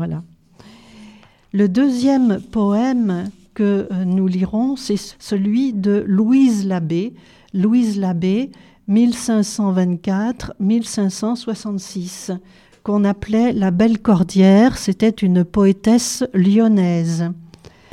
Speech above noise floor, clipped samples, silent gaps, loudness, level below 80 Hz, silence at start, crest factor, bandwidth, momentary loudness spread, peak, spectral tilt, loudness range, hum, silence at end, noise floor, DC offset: 29 dB; under 0.1%; none; -17 LUFS; -48 dBFS; 0 s; 16 dB; 13 kHz; 12 LU; -2 dBFS; -6.5 dB/octave; 5 LU; none; 0.45 s; -45 dBFS; under 0.1%